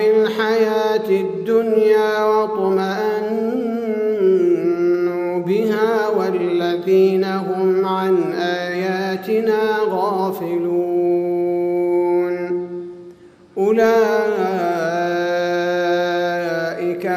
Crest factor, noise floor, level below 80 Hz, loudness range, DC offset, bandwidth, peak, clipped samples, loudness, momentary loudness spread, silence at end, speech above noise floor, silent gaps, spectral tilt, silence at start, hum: 14 dB; -43 dBFS; -66 dBFS; 2 LU; under 0.1%; 15.5 kHz; -4 dBFS; under 0.1%; -18 LUFS; 6 LU; 0 s; 27 dB; none; -6.5 dB/octave; 0 s; none